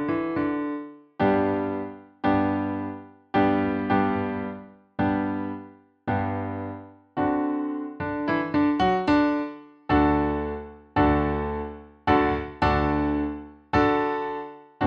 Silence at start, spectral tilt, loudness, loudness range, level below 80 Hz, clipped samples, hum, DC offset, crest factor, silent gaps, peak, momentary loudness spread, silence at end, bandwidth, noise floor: 0 s; -8.5 dB/octave; -25 LUFS; 5 LU; -42 dBFS; under 0.1%; none; under 0.1%; 18 dB; none; -8 dBFS; 14 LU; 0 s; 6.4 kHz; -46 dBFS